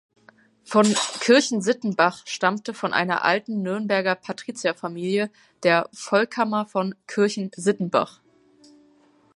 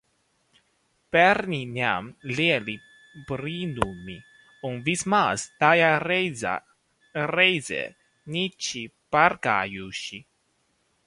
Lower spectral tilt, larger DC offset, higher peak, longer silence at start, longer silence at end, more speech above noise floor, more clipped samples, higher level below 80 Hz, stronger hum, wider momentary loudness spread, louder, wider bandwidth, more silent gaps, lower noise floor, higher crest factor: about the same, -4 dB/octave vs -4 dB/octave; neither; about the same, -4 dBFS vs -2 dBFS; second, 0.7 s vs 1.15 s; first, 1.25 s vs 0.85 s; second, 36 dB vs 45 dB; neither; second, -74 dBFS vs -58 dBFS; neither; second, 9 LU vs 16 LU; about the same, -23 LUFS vs -24 LUFS; about the same, 11.5 kHz vs 11.5 kHz; neither; second, -58 dBFS vs -70 dBFS; about the same, 20 dB vs 24 dB